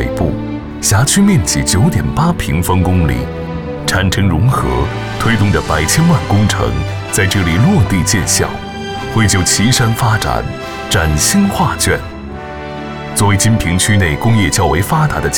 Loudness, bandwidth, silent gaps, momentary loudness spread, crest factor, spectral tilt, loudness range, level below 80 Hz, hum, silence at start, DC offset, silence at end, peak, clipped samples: -13 LUFS; 19.5 kHz; none; 11 LU; 12 dB; -4.5 dB/octave; 2 LU; -26 dBFS; none; 0 s; 0.7%; 0 s; 0 dBFS; under 0.1%